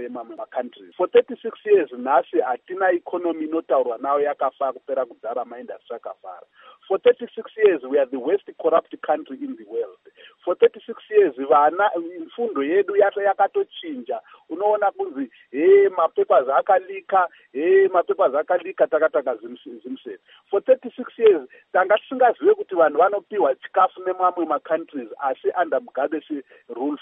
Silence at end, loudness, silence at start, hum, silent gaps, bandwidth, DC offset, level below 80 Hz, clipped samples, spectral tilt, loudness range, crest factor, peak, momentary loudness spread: 0.05 s; -21 LUFS; 0 s; none; none; 3.8 kHz; under 0.1%; -84 dBFS; under 0.1%; -2 dB/octave; 5 LU; 16 dB; -4 dBFS; 16 LU